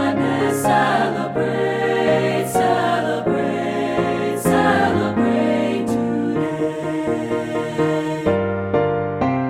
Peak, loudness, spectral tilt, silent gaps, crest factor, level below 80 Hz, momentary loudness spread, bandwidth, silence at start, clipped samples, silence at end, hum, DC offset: -2 dBFS; -19 LUFS; -6 dB/octave; none; 16 dB; -50 dBFS; 6 LU; 16 kHz; 0 s; under 0.1%; 0 s; none; under 0.1%